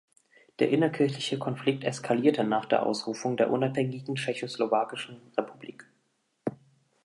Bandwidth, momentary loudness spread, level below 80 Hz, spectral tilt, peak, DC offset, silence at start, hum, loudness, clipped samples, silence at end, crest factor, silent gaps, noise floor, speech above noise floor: 11.5 kHz; 12 LU; -78 dBFS; -5.5 dB/octave; -8 dBFS; under 0.1%; 0.6 s; none; -29 LUFS; under 0.1%; 0.5 s; 20 dB; none; -74 dBFS; 46 dB